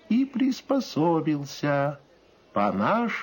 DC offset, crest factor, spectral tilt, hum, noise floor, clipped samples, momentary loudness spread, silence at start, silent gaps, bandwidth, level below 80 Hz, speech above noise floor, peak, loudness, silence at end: under 0.1%; 14 dB; -6.5 dB/octave; none; -57 dBFS; under 0.1%; 6 LU; 0.1 s; none; 17 kHz; -68 dBFS; 32 dB; -12 dBFS; -26 LUFS; 0 s